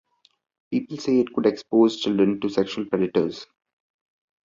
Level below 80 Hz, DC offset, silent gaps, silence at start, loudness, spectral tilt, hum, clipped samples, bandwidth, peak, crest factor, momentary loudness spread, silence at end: -62 dBFS; under 0.1%; none; 0.7 s; -23 LUFS; -6.5 dB/octave; none; under 0.1%; 7.6 kHz; -6 dBFS; 18 dB; 9 LU; 1.05 s